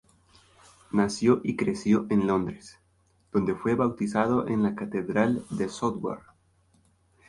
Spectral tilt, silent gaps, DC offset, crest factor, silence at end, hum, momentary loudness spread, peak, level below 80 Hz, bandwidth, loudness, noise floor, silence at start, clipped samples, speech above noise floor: -6.5 dB/octave; none; under 0.1%; 20 dB; 1.1 s; none; 8 LU; -8 dBFS; -58 dBFS; 11.5 kHz; -27 LUFS; -66 dBFS; 0.95 s; under 0.1%; 40 dB